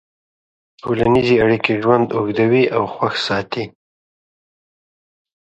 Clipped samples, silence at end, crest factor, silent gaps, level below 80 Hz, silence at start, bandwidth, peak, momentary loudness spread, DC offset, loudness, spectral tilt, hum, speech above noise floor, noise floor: under 0.1%; 1.75 s; 18 dB; none; -48 dBFS; 0.85 s; 8.2 kHz; 0 dBFS; 12 LU; under 0.1%; -17 LUFS; -6.5 dB/octave; none; over 74 dB; under -90 dBFS